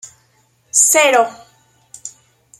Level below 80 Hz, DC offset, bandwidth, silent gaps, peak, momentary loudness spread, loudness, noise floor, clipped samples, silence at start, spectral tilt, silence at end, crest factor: -70 dBFS; under 0.1%; 16.5 kHz; none; 0 dBFS; 24 LU; -12 LUFS; -58 dBFS; under 0.1%; 0.05 s; 1 dB/octave; 0.5 s; 18 dB